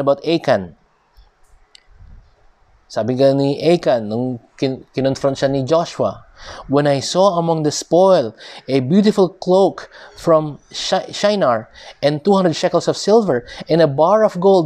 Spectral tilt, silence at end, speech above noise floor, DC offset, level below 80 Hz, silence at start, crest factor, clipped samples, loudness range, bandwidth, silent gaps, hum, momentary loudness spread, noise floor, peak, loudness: -6 dB/octave; 0 s; 36 dB; under 0.1%; -52 dBFS; 0 s; 16 dB; under 0.1%; 4 LU; 12.5 kHz; none; none; 11 LU; -52 dBFS; -2 dBFS; -16 LUFS